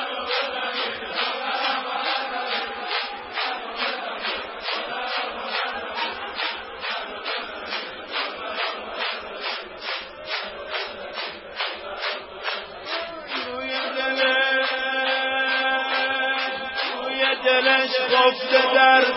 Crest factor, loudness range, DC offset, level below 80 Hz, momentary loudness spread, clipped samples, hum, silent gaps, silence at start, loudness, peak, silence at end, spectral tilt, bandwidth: 22 dB; 9 LU; under 0.1%; -62 dBFS; 11 LU; under 0.1%; none; none; 0 s; -24 LUFS; -2 dBFS; 0 s; -5.5 dB/octave; 5.8 kHz